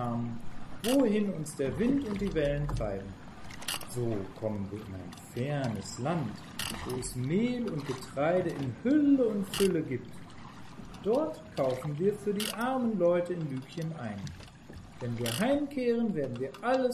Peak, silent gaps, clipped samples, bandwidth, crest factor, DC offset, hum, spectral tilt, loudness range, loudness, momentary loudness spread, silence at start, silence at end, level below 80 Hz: -14 dBFS; none; under 0.1%; 14.5 kHz; 18 dB; under 0.1%; none; -6 dB/octave; 6 LU; -32 LUFS; 16 LU; 0 s; 0 s; -52 dBFS